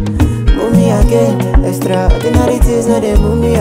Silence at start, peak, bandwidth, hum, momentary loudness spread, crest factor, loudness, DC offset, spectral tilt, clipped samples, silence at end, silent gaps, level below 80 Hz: 0 s; 0 dBFS; 16 kHz; none; 3 LU; 10 dB; -12 LUFS; under 0.1%; -7 dB/octave; under 0.1%; 0 s; none; -14 dBFS